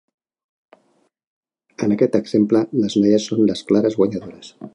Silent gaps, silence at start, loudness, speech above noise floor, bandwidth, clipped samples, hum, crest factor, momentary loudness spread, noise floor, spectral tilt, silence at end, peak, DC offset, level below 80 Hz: none; 1.8 s; -18 LUFS; 44 dB; 10.5 kHz; under 0.1%; none; 18 dB; 9 LU; -62 dBFS; -6.5 dB/octave; 0.05 s; -2 dBFS; under 0.1%; -60 dBFS